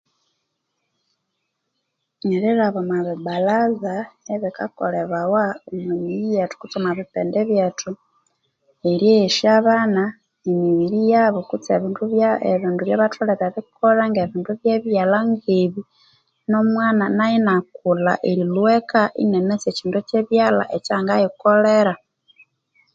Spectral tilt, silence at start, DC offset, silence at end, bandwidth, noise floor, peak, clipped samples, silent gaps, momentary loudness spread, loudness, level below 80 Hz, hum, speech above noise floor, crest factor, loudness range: -6 dB/octave; 2.25 s; under 0.1%; 1 s; 7.8 kHz; -76 dBFS; -2 dBFS; under 0.1%; none; 10 LU; -19 LUFS; -64 dBFS; none; 57 dB; 18 dB; 5 LU